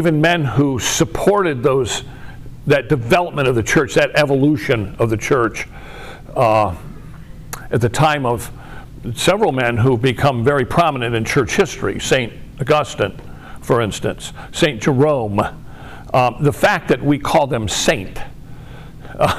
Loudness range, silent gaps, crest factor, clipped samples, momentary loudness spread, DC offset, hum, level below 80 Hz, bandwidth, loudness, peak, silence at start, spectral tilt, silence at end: 3 LU; none; 12 dB; under 0.1%; 20 LU; 0.5%; none; -38 dBFS; 15.5 kHz; -17 LUFS; -4 dBFS; 0 s; -5 dB/octave; 0 s